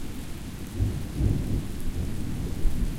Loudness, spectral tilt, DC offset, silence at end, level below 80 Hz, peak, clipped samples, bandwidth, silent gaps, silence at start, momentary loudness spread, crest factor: -31 LUFS; -6.5 dB/octave; under 0.1%; 0 s; -30 dBFS; -10 dBFS; under 0.1%; 16.5 kHz; none; 0 s; 11 LU; 16 dB